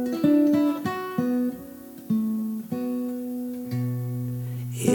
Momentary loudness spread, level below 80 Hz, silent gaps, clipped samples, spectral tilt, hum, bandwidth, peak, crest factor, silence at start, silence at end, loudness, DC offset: 11 LU; -64 dBFS; none; under 0.1%; -7 dB/octave; none; 19 kHz; -6 dBFS; 18 dB; 0 s; 0 s; -26 LUFS; under 0.1%